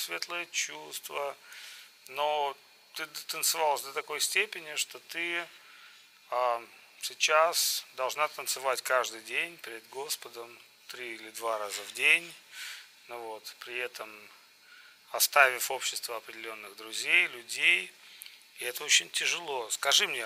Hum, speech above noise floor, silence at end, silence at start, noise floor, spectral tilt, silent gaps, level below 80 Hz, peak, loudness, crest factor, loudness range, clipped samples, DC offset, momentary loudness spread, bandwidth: none; 25 dB; 0 s; 0 s; -56 dBFS; 1 dB/octave; none; under -90 dBFS; -6 dBFS; -29 LUFS; 26 dB; 6 LU; under 0.1%; under 0.1%; 20 LU; 16 kHz